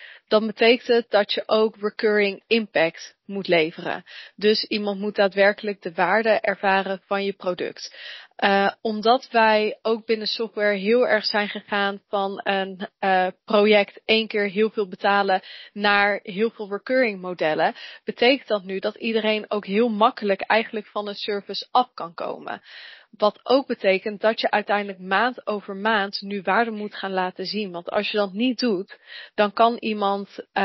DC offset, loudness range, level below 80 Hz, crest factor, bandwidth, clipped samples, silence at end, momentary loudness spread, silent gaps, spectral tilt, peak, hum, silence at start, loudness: under 0.1%; 3 LU; -72 dBFS; 18 dB; 6 kHz; under 0.1%; 0 s; 11 LU; none; -2 dB/octave; -4 dBFS; none; 0 s; -22 LUFS